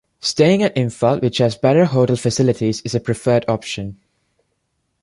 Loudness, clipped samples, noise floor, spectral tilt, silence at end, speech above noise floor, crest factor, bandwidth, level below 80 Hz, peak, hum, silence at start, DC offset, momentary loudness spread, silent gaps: -17 LUFS; under 0.1%; -70 dBFS; -6 dB/octave; 1.1 s; 53 dB; 16 dB; 11.5 kHz; -50 dBFS; -2 dBFS; none; 0.25 s; under 0.1%; 8 LU; none